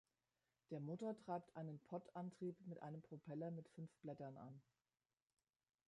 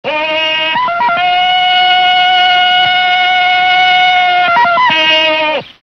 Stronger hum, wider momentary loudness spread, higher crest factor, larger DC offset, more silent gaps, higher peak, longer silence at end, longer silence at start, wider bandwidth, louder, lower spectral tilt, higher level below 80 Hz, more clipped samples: neither; about the same, 7 LU vs 5 LU; first, 18 dB vs 10 dB; neither; neither; second, -36 dBFS vs 0 dBFS; first, 1.25 s vs 0.15 s; first, 0.7 s vs 0.05 s; first, 11 kHz vs 6.8 kHz; second, -53 LUFS vs -8 LUFS; first, -9 dB/octave vs -2 dB/octave; second, under -90 dBFS vs -52 dBFS; neither